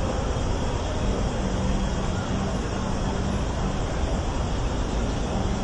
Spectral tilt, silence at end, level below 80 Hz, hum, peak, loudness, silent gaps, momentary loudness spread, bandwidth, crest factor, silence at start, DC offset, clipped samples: -6 dB/octave; 0 s; -30 dBFS; none; -12 dBFS; -27 LUFS; none; 1 LU; 11 kHz; 12 dB; 0 s; under 0.1%; under 0.1%